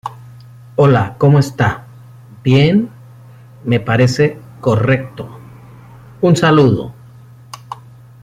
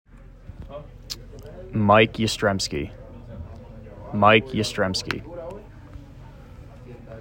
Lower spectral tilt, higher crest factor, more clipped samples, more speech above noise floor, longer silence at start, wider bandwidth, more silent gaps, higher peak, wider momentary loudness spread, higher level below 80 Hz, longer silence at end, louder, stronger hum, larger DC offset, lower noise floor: first, -7 dB/octave vs -5 dB/octave; second, 14 dB vs 24 dB; neither; first, 27 dB vs 22 dB; about the same, 0.05 s vs 0.15 s; second, 12 kHz vs 16 kHz; neither; about the same, -2 dBFS vs -2 dBFS; second, 21 LU vs 27 LU; about the same, -46 dBFS vs -46 dBFS; first, 0.5 s vs 0 s; first, -14 LUFS vs -21 LUFS; neither; neither; second, -39 dBFS vs -43 dBFS